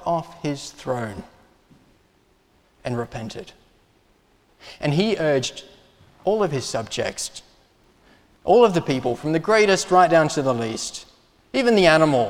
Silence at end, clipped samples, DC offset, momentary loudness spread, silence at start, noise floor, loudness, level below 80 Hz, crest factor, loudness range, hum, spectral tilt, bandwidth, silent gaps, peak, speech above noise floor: 0 s; under 0.1%; under 0.1%; 17 LU; 0 s; -60 dBFS; -21 LUFS; -54 dBFS; 22 dB; 14 LU; none; -4.5 dB/octave; 15.5 kHz; none; 0 dBFS; 40 dB